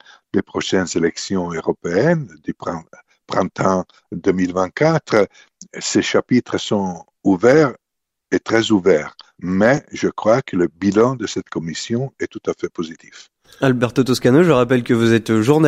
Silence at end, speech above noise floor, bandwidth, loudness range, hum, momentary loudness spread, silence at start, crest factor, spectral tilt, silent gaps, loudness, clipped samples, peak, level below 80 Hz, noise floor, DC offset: 0 s; 62 dB; 15 kHz; 4 LU; none; 12 LU; 0.35 s; 16 dB; -5.5 dB/octave; none; -18 LUFS; under 0.1%; 0 dBFS; -52 dBFS; -80 dBFS; under 0.1%